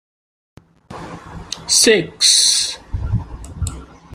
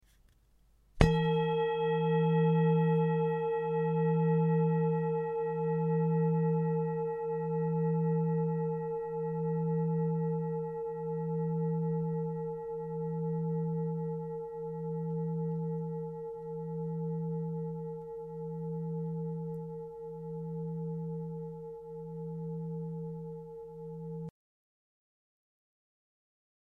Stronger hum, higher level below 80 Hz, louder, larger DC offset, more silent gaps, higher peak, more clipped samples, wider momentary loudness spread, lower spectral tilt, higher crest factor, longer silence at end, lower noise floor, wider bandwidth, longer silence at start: neither; first, -34 dBFS vs -52 dBFS; first, -13 LUFS vs -33 LUFS; neither; neither; first, 0 dBFS vs -6 dBFS; neither; first, 23 LU vs 14 LU; second, -1.5 dB/octave vs -9.5 dB/octave; second, 20 dB vs 26 dB; second, 0 s vs 2.45 s; second, -36 dBFS vs -65 dBFS; first, 16 kHz vs 6.6 kHz; about the same, 0.9 s vs 0.95 s